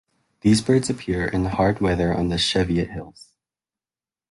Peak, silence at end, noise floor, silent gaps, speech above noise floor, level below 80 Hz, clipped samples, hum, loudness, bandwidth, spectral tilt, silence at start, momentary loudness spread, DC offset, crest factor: -6 dBFS; 1.2 s; under -90 dBFS; none; over 69 dB; -40 dBFS; under 0.1%; none; -21 LUFS; 11.5 kHz; -5.5 dB/octave; 0.45 s; 6 LU; under 0.1%; 18 dB